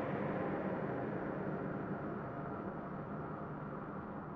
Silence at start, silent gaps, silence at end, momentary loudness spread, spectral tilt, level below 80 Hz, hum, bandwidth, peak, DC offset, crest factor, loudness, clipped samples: 0 s; none; 0 s; 6 LU; -8 dB/octave; -64 dBFS; none; 6 kHz; -28 dBFS; under 0.1%; 14 dB; -42 LUFS; under 0.1%